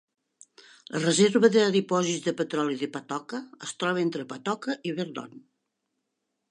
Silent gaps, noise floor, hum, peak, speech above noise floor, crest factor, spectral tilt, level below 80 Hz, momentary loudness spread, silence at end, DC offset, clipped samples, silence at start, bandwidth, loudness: none; -81 dBFS; none; -8 dBFS; 55 dB; 20 dB; -4.5 dB/octave; -80 dBFS; 15 LU; 1.1 s; under 0.1%; under 0.1%; 0.9 s; 11 kHz; -26 LUFS